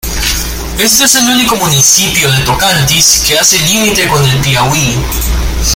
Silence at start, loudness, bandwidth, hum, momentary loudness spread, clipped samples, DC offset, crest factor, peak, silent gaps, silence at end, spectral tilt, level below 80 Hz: 0.05 s; -7 LUFS; over 20 kHz; none; 8 LU; 0.4%; under 0.1%; 10 dB; 0 dBFS; none; 0 s; -2.5 dB/octave; -20 dBFS